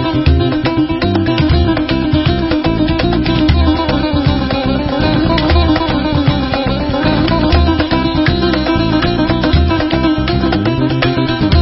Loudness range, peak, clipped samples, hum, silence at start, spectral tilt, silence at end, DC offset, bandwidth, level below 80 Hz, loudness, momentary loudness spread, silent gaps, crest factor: 1 LU; 0 dBFS; under 0.1%; none; 0 s; -10.5 dB/octave; 0 s; under 0.1%; 5.8 kHz; -20 dBFS; -13 LUFS; 3 LU; none; 12 dB